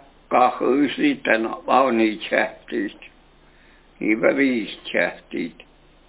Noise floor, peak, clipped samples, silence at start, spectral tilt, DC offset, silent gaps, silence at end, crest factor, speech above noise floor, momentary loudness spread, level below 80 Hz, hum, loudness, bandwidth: -52 dBFS; -2 dBFS; under 0.1%; 0.3 s; -8.5 dB/octave; under 0.1%; none; 0.6 s; 20 dB; 31 dB; 11 LU; -58 dBFS; none; -21 LUFS; 4 kHz